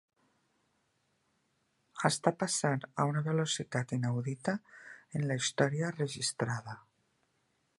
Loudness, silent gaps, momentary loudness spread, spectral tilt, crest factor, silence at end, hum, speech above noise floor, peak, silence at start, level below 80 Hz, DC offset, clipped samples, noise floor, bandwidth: -33 LUFS; none; 11 LU; -4.5 dB/octave; 26 dB; 1 s; none; 44 dB; -10 dBFS; 1.95 s; -74 dBFS; under 0.1%; under 0.1%; -77 dBFS; 11.5 kHz